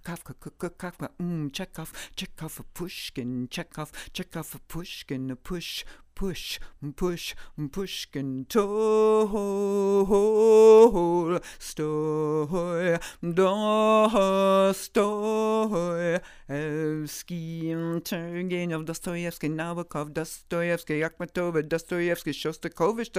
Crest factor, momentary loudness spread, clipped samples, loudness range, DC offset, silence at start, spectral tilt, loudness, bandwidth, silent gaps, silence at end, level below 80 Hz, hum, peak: 20 dB; 16 LU; under 0.1%; 15 LU; under 0.1%; 0.05 s; -5.5 dB/octave; -26 LUFS; 16 kHz; none; 0 s; -50 dBFS; none; -6 dBFS